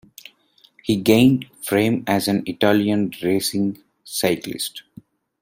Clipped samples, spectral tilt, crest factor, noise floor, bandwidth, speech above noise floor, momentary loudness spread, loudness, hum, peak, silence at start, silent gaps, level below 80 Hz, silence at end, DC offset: under 0.1%; -5 dB/octave; 20 dB; -57 dBFS; 16.5 kHz; 38 dB; 13 LU; -20 LUFS; none; -2 dBFS; 0.85 s; none; -56 dBFS; 0.6 s; under 0.1%